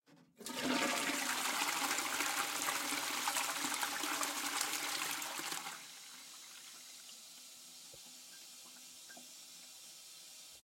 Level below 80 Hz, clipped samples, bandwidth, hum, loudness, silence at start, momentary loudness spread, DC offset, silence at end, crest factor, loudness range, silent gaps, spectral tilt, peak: -86 dBFS; under 0.1%; 16.5 kHz; none; -36 LUFS; 0.1 s; 17 LU; under 0.1%; 0.05 s; 22 dB; 16 LU; none; 0 dB/octave; -18 dBFS